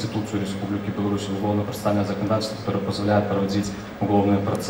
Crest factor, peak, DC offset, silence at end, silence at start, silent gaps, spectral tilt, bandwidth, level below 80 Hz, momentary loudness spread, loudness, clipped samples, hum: 16 dB; -8 dBFS; under 0.1%; 0 s; 0 s; none; -6.5 dB/octave; over 20 kHz; -50 dBFS; 6 LU; -24 LUFS; under 0.1%; none